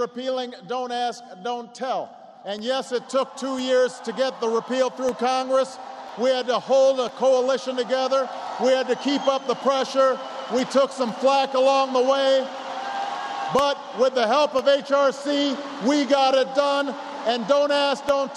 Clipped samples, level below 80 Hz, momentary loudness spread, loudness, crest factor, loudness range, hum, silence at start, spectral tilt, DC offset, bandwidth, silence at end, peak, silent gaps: under 0.1%; -70 dBFS; 10 LU; -22 LUFS; 16 dB; 5 LU; none; 0 s; -3.5 dB/octave; under 0.1%; 11 kHz; 0 s; -6 dBFS; none